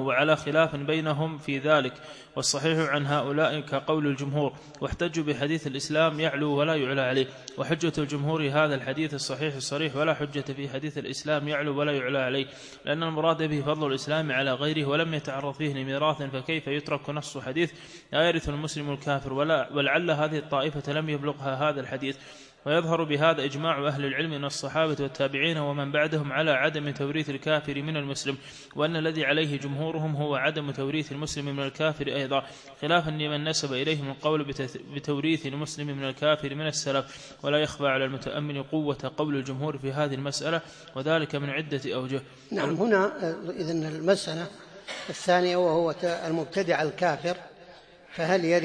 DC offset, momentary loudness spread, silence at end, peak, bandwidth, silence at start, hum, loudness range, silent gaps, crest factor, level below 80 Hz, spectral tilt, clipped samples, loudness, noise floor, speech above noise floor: under 0.1%; 9 LU; 0 s; -8 dBFS; 10.5 kHz; 0 s; none; 3 LU; none; 20 dB; -58 dBFS; -5 dB/octave; under 0.1%; -28 LUFS; -51 dBFS; 23 dB